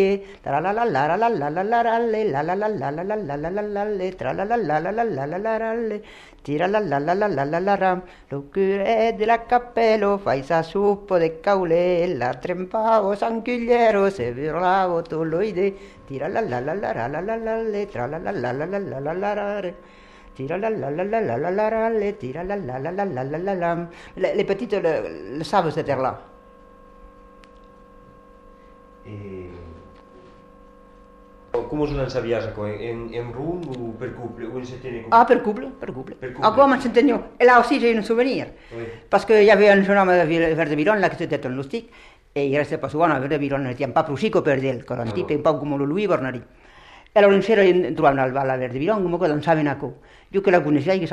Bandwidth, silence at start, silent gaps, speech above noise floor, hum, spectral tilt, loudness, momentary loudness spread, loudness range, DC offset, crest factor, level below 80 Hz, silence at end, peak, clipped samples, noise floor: 10.5 kHz; 0 s; none; 27 dB; none; -7 dB/octave; -21 LUFS; 14 LU; 10 LU; under 0.1%; 20 dB; -50 dBFS; 0 s; -2 dBFS; under 0.1%; -48 dBFS